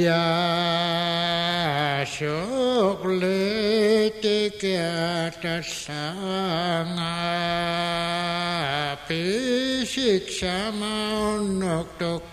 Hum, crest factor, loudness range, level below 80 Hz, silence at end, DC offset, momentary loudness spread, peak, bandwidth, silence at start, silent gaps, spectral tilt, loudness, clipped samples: none; 14 dB; 3 LU; -52 dBFS; 0 s; under 0.1%; 6 LU; -10 dBFS; 15 kHz; 0 s; none; -4.5 dB/octave; -24 LUFS; under 0.1%